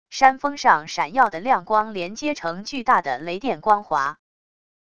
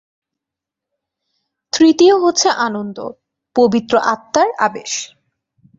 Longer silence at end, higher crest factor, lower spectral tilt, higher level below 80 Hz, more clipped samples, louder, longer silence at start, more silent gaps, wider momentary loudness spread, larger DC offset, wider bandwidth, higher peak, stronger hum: about the same, 0.75 s vs 0.75 s; first, 22 dB vs 16 dB; about the same, -3.5 dB/octave vs -3 dB/octave; about the same, -58 dBFS vs -60 dBFS; neither; second, -21 LUFS vs -15 LUFS; second, 0.1 s vs 1.75 s; neither; second, 9 LU vs 15 LU; first, 0.5% vs under 0.1%; first, 8.6 kHz vs 7.8 kHz; about the same, 0 dBFS vs -2 dBFS; neither